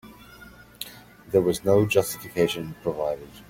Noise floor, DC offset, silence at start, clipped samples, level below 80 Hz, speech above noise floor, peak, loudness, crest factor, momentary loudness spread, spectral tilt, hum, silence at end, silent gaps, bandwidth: -48 dBFS; under 0.1%; 0.05 s; under 0.1%; -54 dBFS; 24 dB; -6 dBFS; -24 LUFS; 20 dB; 18 LU; -5.5 dB/octave; none; 0.05 s; none; 16.5 kHz